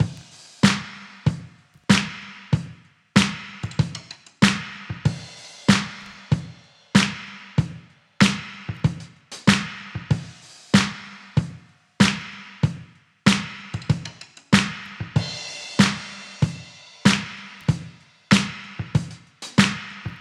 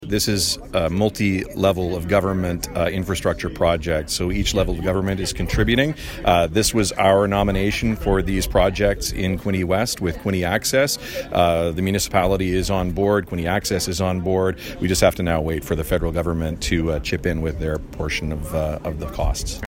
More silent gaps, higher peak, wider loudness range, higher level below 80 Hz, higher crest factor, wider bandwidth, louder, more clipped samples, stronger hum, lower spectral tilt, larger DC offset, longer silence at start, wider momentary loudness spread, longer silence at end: neither; about the same, 0 dBFS vs -2 dBFS; about the same, 1 LU vs 3 LU; second, -48 dBFS vs -32 dBFS; about the same, 24 dB vs 20 dB; second, 12.5 kHz vs 16.5 kHz; about the same, -23 LUFS vs -21 LUFS; neither; neither; about the same, -4.5 dB/octave vs -5 dB/octave; neither; about the same, 0 s vs 0 s; first, 18 LU vs 6 LU; about the same, 0 s vs 0 s